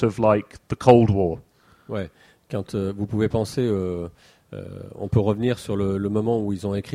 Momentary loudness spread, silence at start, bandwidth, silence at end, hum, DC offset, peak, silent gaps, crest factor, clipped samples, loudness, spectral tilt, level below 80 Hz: 20 LU; 0 s; 13.5 kHz; 0 s; none; under 0.1%; 0 dBFS; none; 22 dB; under 0.1%; -23 LUFS; -8 dB/octave; -48 dBFS